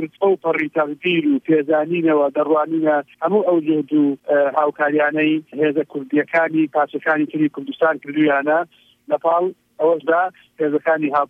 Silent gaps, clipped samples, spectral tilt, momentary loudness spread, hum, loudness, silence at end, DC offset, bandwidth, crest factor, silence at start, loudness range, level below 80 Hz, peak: none; under 0.1%; -8 dB/octave; 4 LU; none; -19 LUFS; 0.05 s; under 0.1%; 3.7 kHz; 14 dB; 0 s; 2 LU; -74 dBFS; -4 dBFS